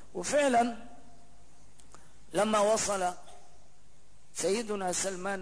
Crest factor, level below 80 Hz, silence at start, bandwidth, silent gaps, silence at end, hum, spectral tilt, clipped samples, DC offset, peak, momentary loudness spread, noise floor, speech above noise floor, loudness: 16 dB; -62 dBFS; 0.15 s; 11 kHz; none; 0 s; 50 Hz at -70 dBFS; -3 dB/octave; under 0.1%; 0.7%; -16 dBFS; 10 LU; -62 dBFS; 33 dB; -30 LUFS